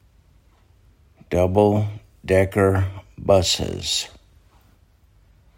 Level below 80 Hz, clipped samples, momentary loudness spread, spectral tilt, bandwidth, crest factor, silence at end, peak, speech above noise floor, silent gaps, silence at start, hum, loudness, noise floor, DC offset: -48 dBFS; under 0.1%; 12 LU; -5 dB/octave; 16.5 kHz; 20 dB; 1.5 s; -2 dBFS; 37 dB; none; 1.3 s; none; -20 LUFS; -56 dBFS; under 0.1%